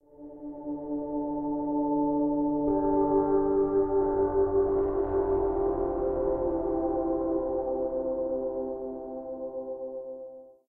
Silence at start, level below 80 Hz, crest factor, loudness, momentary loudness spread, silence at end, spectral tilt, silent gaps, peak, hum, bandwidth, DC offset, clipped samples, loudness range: 0.2 s; -46 dBFS; 14 dB; -28 LUFS; 12 LU; 0.15 s; -13 dB/octave; none; -14 dBFS; none; 2.2 kHz; under 0.1%; under 0.1%; 5 LU